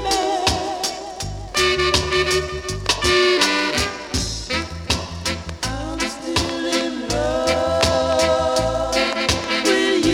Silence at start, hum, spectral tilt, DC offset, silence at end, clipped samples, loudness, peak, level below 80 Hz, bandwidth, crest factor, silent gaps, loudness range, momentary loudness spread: 0 s; none; -3 dB/octave; under 0.1%; 0 s; under 0.1%; -20 LUFS; -2 dBFS; -34 dBFS; 17 kHz; 18 dB; none; 5 LU; 9 LU